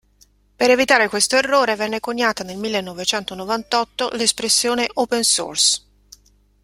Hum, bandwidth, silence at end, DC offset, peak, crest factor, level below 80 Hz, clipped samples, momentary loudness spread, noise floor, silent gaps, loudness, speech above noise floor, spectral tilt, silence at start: 50 Hz at -55 dBFS; 16 kHz; 0.85 s; under 0.1%; 0 dBFS; 20 dB; -56 dBFS; under 0.1%; 9 LU; -56 dBFS; none; -18 LUFS; 37 dB; -1 dB/octave; 0.6 s